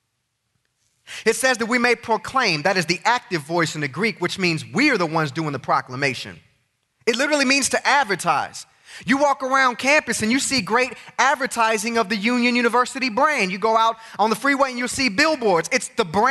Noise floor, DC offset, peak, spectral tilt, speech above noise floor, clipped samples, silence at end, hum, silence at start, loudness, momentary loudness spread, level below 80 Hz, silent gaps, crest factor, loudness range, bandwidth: -74 dBFS; under 0.1%; -4 dBFS; -3.5 dB/octave; 53 dB; under 0.1%; 0 s; none; 1.1 s; -20 LUFS; 6 LU; -60 dBFS; none; 18 dB; 3 LU; 12 kHz